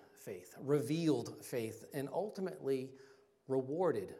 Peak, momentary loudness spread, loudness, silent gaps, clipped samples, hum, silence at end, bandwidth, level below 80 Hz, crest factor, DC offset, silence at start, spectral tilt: -22 dBFS; 13 LU; -38 LUFS; none; under 0.1%; none; 0 s; 16 kHz; -84 dBFS; 18 dB; under 0.1%; 0.15 s; -6.5 dB/octave